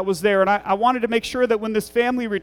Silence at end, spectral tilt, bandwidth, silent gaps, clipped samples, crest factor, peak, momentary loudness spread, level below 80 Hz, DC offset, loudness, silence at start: 0 s; -5 dB/octave; 18 kHz; none; under 0.1%; 14 dB; -6 dBFS; 4 LU; -52 dBFS; under 0.1%; -20 LUFS; 0 s